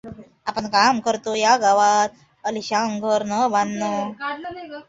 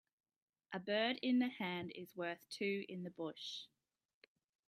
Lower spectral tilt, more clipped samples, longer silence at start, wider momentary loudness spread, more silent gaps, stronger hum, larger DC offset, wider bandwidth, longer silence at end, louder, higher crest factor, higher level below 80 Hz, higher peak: second, -3 dB/octave vs -5 dB/octave; neither; second, 0.05 s vs 0.7 s; about the same, 14 LU vs 13 LU; neither; neither; neither; second, 8 kHz vs 15 kHz; second, 0.05 s vs 1 s; first, -20 LUFS vs -42 LUFS; about the same, 18 dB vs 18 dB; first, -62 dBFS vs -90 dBFS; first, -2 dBFS vs -26 dBFS